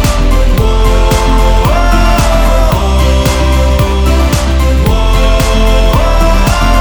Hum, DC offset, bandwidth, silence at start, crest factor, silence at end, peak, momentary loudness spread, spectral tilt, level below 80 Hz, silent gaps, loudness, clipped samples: none; under 0.1%; over 20 kHz; 0 s; 8 dB; 0 s; 0 dBFS; 1 LU; -5.5 dB/octave; -8 dBFS; none; -10 LUFS; under 0.1%